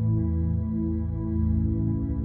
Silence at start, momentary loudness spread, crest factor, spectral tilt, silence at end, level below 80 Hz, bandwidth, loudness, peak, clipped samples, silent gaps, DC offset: 0 s; 3 LU; 10 dB; -14.5 dB/octave; 0 s; -32 dBFS; 2.1 kHz; -27 LUFS; -14 dBFS; under 0.1%; none; under 0.1%